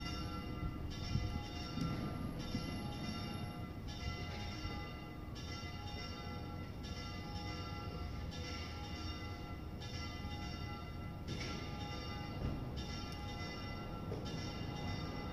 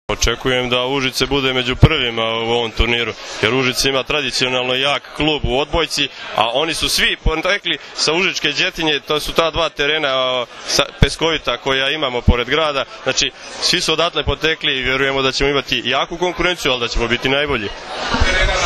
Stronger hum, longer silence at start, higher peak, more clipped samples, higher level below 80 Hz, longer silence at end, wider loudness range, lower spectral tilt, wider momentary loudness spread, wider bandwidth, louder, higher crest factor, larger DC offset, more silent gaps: neither; about the same, 0 s vs 0.1 s; second, -24 dBFS vs 0 dBFS; neither; second, -50 dBFS vs -28 dBFS; about the same, 0 s vs 0 s; about the same, 3 LU vs 1 LU; first, -5.5 dB/octave vs -3.5 dB/octave; about the same, 4 LU vs 4 LU; first, 15.5 kHz vs 14 kHz; second, -44 LUFS vs -16 LUFS; about the same, 18 dB vs 18 dB; neither; neither